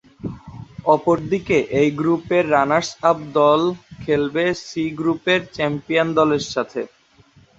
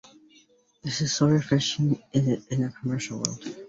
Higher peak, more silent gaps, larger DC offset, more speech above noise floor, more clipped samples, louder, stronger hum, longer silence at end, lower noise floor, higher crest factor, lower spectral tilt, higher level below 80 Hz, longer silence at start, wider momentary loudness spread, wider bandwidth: about the same, -2 dBFS vs -4 dBFS; neither; neither; about the same, 34 dB vs 34 dB; neither; first, -19 LUFS vs -26 LUFS; neither; first, 0.7 s vs 0 s; second, -52 dBFS vs -60 dBFS; second, 18 dB vs 24 dB; about the same, -5.5 dB/octave vs -5 dB/octave; first, -52 dBFS vs -60 dBFS; second, 0.25 s vs 0.85 s; first, 14 LU vs 9 LU; about the same, 8 kHz vs 8 kHz